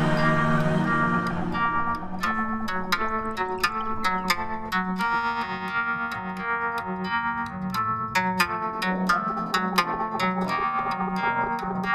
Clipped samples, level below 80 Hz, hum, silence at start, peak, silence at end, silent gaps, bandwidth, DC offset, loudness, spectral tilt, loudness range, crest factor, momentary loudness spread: under 0.1%; -46 dBFS; none; 0 s; -6 dBFS; 0 s; none; 15 kHz; under 0.1%; -26 LUFS; -5.5 dB/octave; 2 LU; 20 dB; 5 LU